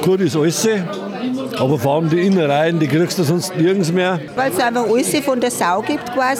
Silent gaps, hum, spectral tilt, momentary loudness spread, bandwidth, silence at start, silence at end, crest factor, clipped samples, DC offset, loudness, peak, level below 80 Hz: none; none; -5 dB/octave; 6 LU; 17 kHz; 0 s; 0 s; 14 dB; under 0.1%; under 0.1%; -17 LUFS; -2 dBFS; -60 dBFS